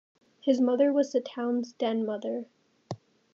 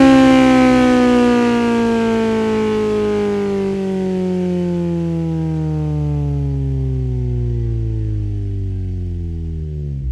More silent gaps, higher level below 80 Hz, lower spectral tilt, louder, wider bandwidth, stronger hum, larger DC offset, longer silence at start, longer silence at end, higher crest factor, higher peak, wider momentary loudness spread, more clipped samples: neither; second, -88 dBFS vs -28 dBFS; second, -6 dB/octave vs -7.5 dB/octave; second, -28 LUFS vs -17 LUFS; second, 7.4 kHz vs 12 kHz; neither; neither; first, 0.45 s vs 0 s; first, 0.4 s vs 0 s; about the same, 18 dB vs 16 dB; second, -12 dBFS vs 0 dBFS; first, 19 LU vs 12 LU; neither